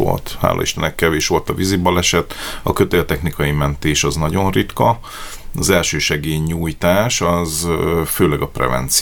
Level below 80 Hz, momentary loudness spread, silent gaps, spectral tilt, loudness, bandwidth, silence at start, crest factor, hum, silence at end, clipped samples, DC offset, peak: -32 dBFS; 6 LU; none; -4 dB/octave; -17 LUFS; over 20 kHz; 0 s; 16 dB; none; 0 s; under 0.1%; under 0.1%; 0 dBFS